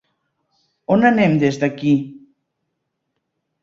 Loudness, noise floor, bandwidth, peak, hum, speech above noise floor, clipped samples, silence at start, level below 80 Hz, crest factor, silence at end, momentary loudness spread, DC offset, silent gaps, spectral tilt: -17 LUFS; -75 dBFS; 7.6 kHz; -2 dBFS; none; 59 dB; under 0.1%; 0.9 s; -58 dBFS; 18 dB; 1.5 s; 14 LU; under 0.1%; none; -7.5 dB/octave